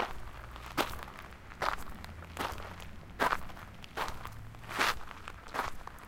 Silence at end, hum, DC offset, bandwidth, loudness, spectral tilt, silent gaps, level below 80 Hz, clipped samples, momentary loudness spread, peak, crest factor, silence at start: 0 s; none; under 0.1%; 17 kHz; -37 LUFS; -3.5 dB/octave; none; -50 dBFS; under 0.1%; 16 LU; -12 dBFS; 26 dB; 0 s